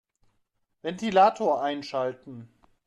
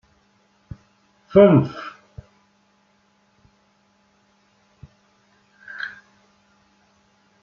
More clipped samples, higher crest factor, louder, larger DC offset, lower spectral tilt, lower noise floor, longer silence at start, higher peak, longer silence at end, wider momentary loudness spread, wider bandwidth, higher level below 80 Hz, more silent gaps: neither; about the same, 20 dB vs 24 dB; second, -25 LUFS vs -18 LUFS; neither; second, -5.5 dB/octave vs -7.5 dB/octave; first, -74 dBFS vs -62 dBFS; second, 0.85 s vs 1.35 s; second, -8 dBFS vs -2 dBFS; second, 0.4 s vs 1.55 s; second, 23 LU vs 30 LU; first, 10 kHz vs 6.8 kHz; second, -70 dBFS vs -56 dBFS; neither